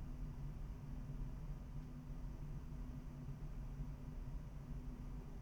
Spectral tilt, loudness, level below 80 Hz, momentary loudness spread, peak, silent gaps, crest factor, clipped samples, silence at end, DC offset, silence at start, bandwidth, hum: -8 dB/octave; -52 LUFS; -50 dBFS; 2 LU; -36 dBFS; none; 12 dB; under 0.1%; 0 s; under 0.1%; 0 s; 19.5 kHz; none